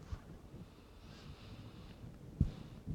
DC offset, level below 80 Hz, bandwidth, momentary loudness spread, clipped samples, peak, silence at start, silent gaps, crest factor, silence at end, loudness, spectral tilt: under 0.1%; -50 dBFS; 16.5 kHz; 17 LU; under 0.1%; -18 dBFS; 0 s; none; 28 dB; 0 s; -47 LUFS; -7.5 dB/octave